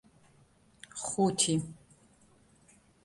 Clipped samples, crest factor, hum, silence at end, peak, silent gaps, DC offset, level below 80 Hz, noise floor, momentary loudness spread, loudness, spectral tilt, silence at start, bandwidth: under 0.1%; 22 dB; none; 1.3 s; -12 dBFS; none; under 0.1%; -66 dBFS; -64 dBFS; 18 LU; -30 LUFS; -4 dB/octave; 0.95 s; 11.5 kHz